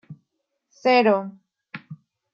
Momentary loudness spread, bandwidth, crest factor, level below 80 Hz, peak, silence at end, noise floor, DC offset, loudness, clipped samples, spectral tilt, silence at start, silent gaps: 23 LU; 7.6 kHz; 20 dB; -80 dBFS; -6 dBFS; 0.4 s; -77 dBFS; under 0.1%; -20 LUFS; under 0.1%; -6 dB/octave; 0.1 s; none